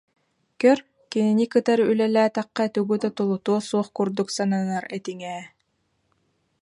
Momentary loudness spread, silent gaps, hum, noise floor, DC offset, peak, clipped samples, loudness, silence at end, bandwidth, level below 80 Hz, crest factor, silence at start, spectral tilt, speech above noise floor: 12 LU; none; none; -71 dBFS; under 0.1%; -6 dBFS; under 0.1%; -23 LUFS; 1.15 s; 11.5 kHz; -72 dBFS; 18 dB; 0.6 s; -6 dB/octave; 49 dB